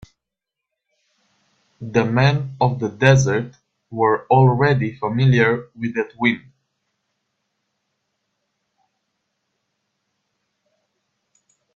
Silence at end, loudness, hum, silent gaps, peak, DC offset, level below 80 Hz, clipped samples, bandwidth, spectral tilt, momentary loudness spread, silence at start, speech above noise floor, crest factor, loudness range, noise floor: 5.35 s; -18 LUFS; none; none; 0 dBFS; under 0.1%; -54 dBFS; under 0.1%; 7.4 kHz; -6.5 dB/octave; 10 LU; 1.8 s; 66 dB; 22 dB; 10 LU; -84 dBFS